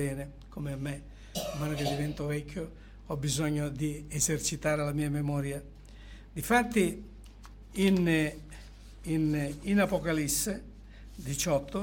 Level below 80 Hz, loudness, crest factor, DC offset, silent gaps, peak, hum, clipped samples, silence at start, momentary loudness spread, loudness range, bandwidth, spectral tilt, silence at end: -48 dBFS; -31 LUFS; 18 dB; under 0.1%; none; -14 dBFS; none; under 0.1%; 0 s; 22 LU; 4 LU; 17 kHz; -5 dB/octave; 0 s